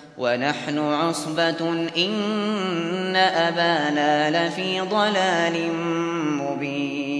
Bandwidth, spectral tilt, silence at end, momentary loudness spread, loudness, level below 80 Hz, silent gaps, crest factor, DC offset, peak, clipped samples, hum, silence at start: 11 kHz; -4.5 dB/octave; 0 s; 5 LU; -22 LUFS; -70 dBFS; none; 16 dB; under 0.1%; -6 dBFS; under 0.1%; none; 0 s